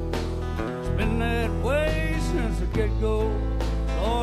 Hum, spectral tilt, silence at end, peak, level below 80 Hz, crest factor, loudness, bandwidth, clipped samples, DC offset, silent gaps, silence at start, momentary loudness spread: none; -6.5 dB/octave; 0 s; -12 dBFS; -28 dBFS; 12 dB; -26 LUFS; 13 kHz; under 0.1%; under 0.1%; none; 0 s; 5 LU